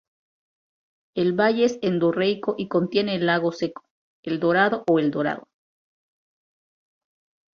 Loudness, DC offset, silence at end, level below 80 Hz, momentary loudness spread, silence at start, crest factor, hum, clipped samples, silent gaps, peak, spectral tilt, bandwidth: -23 LUFS; under 0.1%; 2.15 s; -66 dBFS; 11 LU; 1.15 s; 20 dB; none; under 0.1%; 3.90-4.23 s; -4 dBFS; -6.5 dB/octave; 7 kHz